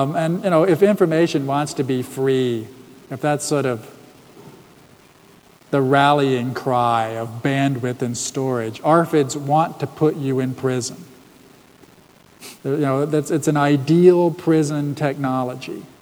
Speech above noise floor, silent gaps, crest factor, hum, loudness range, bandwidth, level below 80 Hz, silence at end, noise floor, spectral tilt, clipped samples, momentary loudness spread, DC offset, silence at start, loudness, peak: 31 dB; none; 18 dB; none; 6 LU; over 20 kHz; -64 dBFS; 0.15 s; -50 dBFS; -6 dB/octave; under 0.1%; 10 LU; under 0.1%; 0 s; -19 LUFS; -2 dBFS